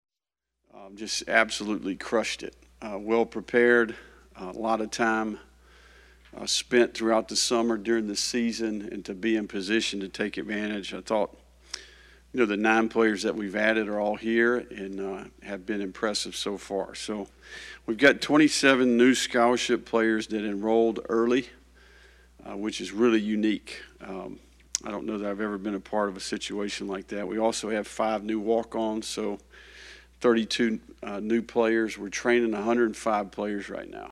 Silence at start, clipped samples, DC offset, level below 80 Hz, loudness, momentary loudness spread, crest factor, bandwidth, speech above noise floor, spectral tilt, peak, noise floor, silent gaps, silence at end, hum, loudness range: 0.75 s; under 0.1%; under 0.1%; -58 dBFS; -26 LUFS; 17 LU; 22 dB; 13 kHz; 61 dB; -3.5 dB/octave; -6 dBFS; -88 dBFS; none; 0 s; none; 7 LU